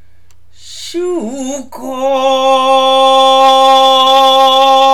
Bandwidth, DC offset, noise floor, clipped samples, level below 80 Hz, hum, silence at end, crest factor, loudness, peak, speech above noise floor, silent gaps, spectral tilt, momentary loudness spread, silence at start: 17.5 kHz; 2%; -49 dBFS; 0.6%; -54 dBFS; none; 0 s; 10 dB; -8 LUFS; 0 dBFS; 38 dB; none; -1.5 dB/octave; 15 LU; 0.65 s